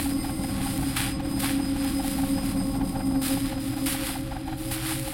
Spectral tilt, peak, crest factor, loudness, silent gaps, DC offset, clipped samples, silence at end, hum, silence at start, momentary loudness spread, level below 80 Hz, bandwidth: -4.5 dB/octave; -12 dBFS; 16 dB; -28 LUFS; none; under 0.1%; under 0.1%; 0 s; none; 0 s; 4 LU; -38 dBFS; 17 kHz